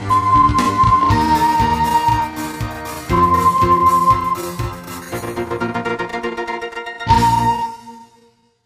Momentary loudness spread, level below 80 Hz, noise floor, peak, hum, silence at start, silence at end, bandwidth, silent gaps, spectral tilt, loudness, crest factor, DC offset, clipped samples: 13 LU; -32 dBFS; -54 dBFS; 0 dBFS; none; 0 s; 0.6 s; 15.5 kHz; none; -5.5 dB/octave; -16 LUFS; 16 dB; under 0.1%; under 0.1%